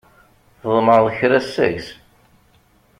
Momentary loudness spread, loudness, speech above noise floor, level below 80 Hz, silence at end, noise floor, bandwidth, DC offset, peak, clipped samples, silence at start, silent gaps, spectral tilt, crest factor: 16 LU; -17 LUFS; 39 dB; -54 dBFS; 1.05 s; -56 dBFS; 13.5 kHz; under 0.1%; -2 dBFS; under 0.1%; 0.65 s; none; -6.5 dB/octave; 18 dB